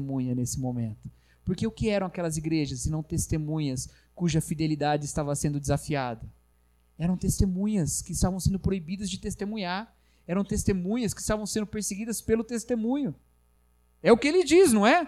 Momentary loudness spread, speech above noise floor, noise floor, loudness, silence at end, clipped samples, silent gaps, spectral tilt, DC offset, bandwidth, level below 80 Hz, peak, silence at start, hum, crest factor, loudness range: 12 LU; 38 dB; -64 dBFS; -28 LUFS; 0 s; under 0.1%; none; -5.5 dB/octave; under 0.1%; 15 kHz; -44 dBFS; -6 dBFS; 0 s; 60 Hz at -50 dBFS; 22 dB; 3 LU